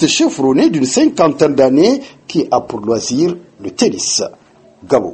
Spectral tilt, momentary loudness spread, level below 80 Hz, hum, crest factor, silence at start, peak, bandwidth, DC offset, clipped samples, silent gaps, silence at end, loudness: -4 dB/octave; 9 LU; -52 dBFS; none; 14 dB; 0 s; 0 dBFS; 8.8 kHz; under 0.1%; under 0.1%; none; 0 s; -14 LUFS